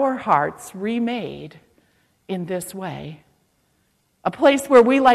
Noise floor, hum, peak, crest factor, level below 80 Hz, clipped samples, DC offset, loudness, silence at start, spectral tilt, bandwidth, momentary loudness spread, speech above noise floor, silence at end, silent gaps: -66 dBFS; none; -4 dBFS; 18 dB; -60 dBFS; under 0.1%; under 0.1%; -20 LUFS; 0 s; -5 dB/octave; 14 kHz; 21 LU; 47 dB; 0 s; none